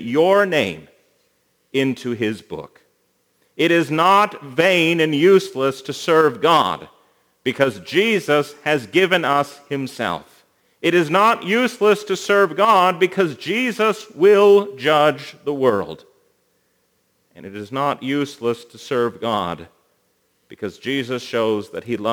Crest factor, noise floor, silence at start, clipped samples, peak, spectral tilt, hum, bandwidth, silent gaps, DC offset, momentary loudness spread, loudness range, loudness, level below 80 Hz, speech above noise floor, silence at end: 18 dB; -65 dBFS; 0 s; under 0.1%; -2 dBFS; -5 dB/octave; none; over 20 kHz; none; under 0.1%; 13 LU; 9 LU; -18 LUFS; -66 dBFS; 47 dB; 0 s